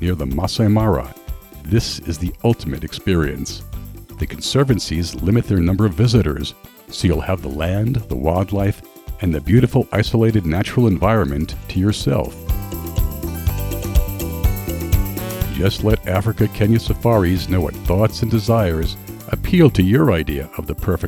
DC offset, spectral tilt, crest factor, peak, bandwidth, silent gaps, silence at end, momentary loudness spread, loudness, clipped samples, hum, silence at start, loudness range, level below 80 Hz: under 0.1%; -6.5 dB/octave; 18 dB; 0 dBFS; over 20 kHz; none; 0 s; 11 LU; -19 LUFS; under 0.1%; none; 0 s; 4 LU; -28 dBFS